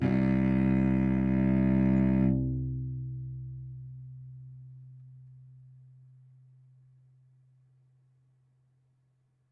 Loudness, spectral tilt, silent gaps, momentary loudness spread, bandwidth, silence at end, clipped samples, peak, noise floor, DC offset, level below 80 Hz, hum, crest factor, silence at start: -28 LUFS; -11 dB/octave; none; 23 LU; 4.5 kHz; 4.15 s; under 0.1%; -14 dBFS; -71 dBFS; under 0.1%; -46 dBFS; none; 16 dB; 0 s